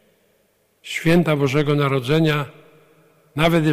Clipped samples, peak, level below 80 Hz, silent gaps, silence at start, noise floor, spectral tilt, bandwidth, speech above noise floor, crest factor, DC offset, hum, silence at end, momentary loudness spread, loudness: under 0.1%; -6 dBFS; -44 dBFS; none; 0.85 s; -63 dBFS; -6.5 dB/octave; 15.5 kHz; 45 dB; 14 dB; under 0.1%; none; 0 s; 11 LU; -19 LUFS